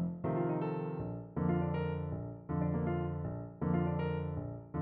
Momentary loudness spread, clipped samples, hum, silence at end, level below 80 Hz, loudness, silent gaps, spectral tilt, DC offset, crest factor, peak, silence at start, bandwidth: 8 LU; under 0.1%; none; 0 s; -54 dBFS; -37 LUFS; none; -9 dB/octave; under 0.1%; 14 dB; -22 dBFS; 0 s; 4.3 kHz